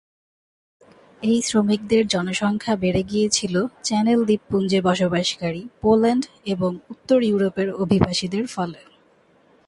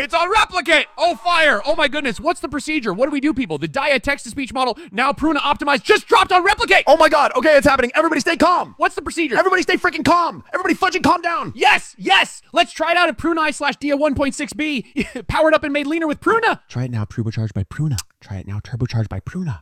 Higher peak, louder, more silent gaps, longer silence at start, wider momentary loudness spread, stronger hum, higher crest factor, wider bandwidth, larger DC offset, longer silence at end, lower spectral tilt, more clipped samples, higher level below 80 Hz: about the same, -2 dBFS vs 0 dBFS; second, -21 LUFS vs -17 LUFS; neither; first, 1.2 s vs 0 s; second, 8 LU vs 11 LU; neither; about the same, 20 dB vs 18 dB; second, 11.5 kHz vs 15.5 kHz; neither; first, 0.9 s vs 0 s; about the same, -5 dB/octave vs -4.5 dB/octave; neither; second, -50 dBFS vs -42 dBFS